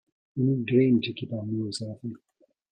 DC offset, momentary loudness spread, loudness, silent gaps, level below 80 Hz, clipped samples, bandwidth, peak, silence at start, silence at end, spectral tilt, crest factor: under 0.1%; 17 LU; -27 LUFS; none; -66 dBFS; under 0.1%; 9.4 kHz; -10 dBFS; 0.35 s; 0.55 s; -7 dB/octave; 18 dB